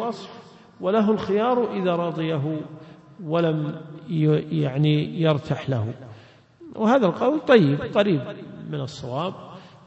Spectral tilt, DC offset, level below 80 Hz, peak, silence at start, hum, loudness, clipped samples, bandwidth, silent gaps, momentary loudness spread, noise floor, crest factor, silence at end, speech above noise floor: -8 dB/octave; under 0.1%; -62 dBFS; -2 dBFS; 0 s; none; -23 LUFS; under 0.1%; 8 kHz; none; 18 LU; -49 dBFS; 20 dB; 0.2 s; 27 dB